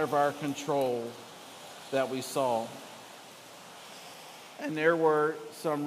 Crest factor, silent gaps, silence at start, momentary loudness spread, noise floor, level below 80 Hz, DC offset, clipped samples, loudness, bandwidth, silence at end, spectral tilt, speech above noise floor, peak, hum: 20 dB; none; 0 s; 21 LU; -49 dBFS; -84 dBFS; under 0.1%; under 0.1%; -30 LUFS; 15.5 kHz; 0 s; -4.5 dB/octave; 20 dB; -12 dBFS; none